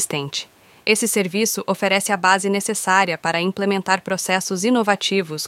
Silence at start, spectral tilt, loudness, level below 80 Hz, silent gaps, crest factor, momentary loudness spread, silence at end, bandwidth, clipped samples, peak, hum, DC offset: 0 s; -3 dB/octave; -19 LUFS; -68 dBFS; none; 18 dB; 5 LU; 0 s; 16.5 kHz; under 0.1%; -2 dBFS; none; under 0.1%